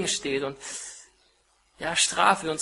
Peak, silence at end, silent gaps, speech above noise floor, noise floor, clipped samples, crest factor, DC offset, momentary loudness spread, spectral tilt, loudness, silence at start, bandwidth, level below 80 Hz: -6 dBFS; 0 s; none; 39 dB; -65 dBFS; under 0.1%; 22 dB; under 0.1%; 17 LU; -1.5 dB/octave; -25 LUFS; 0 s; 11.5 kHz; -62 dBFS